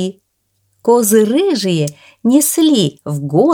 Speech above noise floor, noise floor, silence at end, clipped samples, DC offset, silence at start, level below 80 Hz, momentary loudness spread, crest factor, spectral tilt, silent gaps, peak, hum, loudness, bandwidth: 52 dB; -65 dBFS; 0 s; under 0.1%; under 0.1%; 0 s; -64 dBFS; 11 LU; 14 dB; -5 dB/octave; none; 0 dBFS; none; -14 LUFS; 19.5 kHz